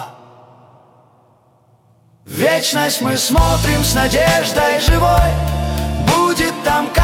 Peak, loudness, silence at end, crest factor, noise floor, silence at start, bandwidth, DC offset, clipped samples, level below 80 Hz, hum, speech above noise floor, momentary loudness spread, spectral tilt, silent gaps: -2 dBFS; -15 LUFS; 0 s; 14 dB; -53 dBFS; 0 s; 18 kHz; under 0.1%; under 0.1%; -24 dBFS; none; 39 dB; 6 LU; -4 dB/octave; none